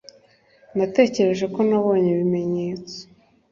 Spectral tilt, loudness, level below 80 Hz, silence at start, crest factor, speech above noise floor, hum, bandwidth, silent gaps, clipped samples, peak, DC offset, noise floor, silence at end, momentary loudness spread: -7 dB/octave; -21 LUFS; -62 dBFS; 0.75 s; 20 dB; 36 dB; none; 7.4 kHz; none; under 0.1%; -2 dBFS; under 0.1%; -56 dBFS; 0.5 s; 13 LU